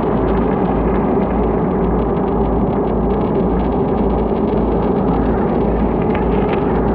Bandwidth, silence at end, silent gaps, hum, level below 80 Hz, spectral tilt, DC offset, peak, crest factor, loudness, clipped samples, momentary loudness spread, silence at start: 4.5 kHz; 0 s; none; none; -24 dBFS; -12 dB/octave; under 0.1%; -4 dBFS; 12 dB; -16 LUFS; under 0.1%; 1 LU; 0 s